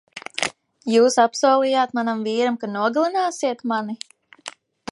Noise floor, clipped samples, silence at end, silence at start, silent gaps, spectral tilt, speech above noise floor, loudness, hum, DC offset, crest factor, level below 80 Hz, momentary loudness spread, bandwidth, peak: -41 dBFS; under 0.1%; 0.4 s; 0.15 s; none; -3.5 dB/octave; 22 dB; -20 LUFS; none; under 0.1%; 18 dB; -74 dBFS; 21 LU; 11.5 kHz; -2 dBFS